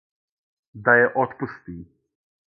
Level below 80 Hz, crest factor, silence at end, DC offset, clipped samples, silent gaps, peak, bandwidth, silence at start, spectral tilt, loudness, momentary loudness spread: -58 dBFS; 22 dB; 0.7 s; under 0.1%; under 0.1%; none; -2 dBFS; 5 kHz; 0.75 s; -10 dB/octave; -20 LUFS; 23 LU